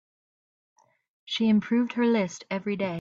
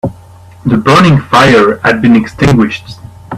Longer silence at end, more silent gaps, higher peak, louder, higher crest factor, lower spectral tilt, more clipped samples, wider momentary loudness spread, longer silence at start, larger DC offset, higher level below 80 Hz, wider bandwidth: about the same, 0 s vs 0 s; neither; second, -14 dBFS vs 0 dBFS; second, -26 LUFS vs -8 LUFS; first, 14 dB vs 8 dB; about the same, -6 dB/octave vs -6.5 dB/octave; second, under 0.1% vs 0.2%; second, 8 LU vs 11 LU; first, 1.25 s vs 0.05 s; neither; second, -72 dBFS vs -34 dBFS; second, 7.6 kHz vs 13.5 kHz